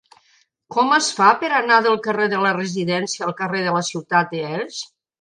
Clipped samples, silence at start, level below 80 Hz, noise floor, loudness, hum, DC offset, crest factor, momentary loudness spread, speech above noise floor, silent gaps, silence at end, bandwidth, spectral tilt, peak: under 0.1%; 0.7 s; -70 dBFS; -60 dBFS; -19 LUFS; none; under 0.1%; 20 dB; 11 LU; 41 dB; none; 0.35 s; 10.5 kHz; -3.5 dB/octave; 0 dBFS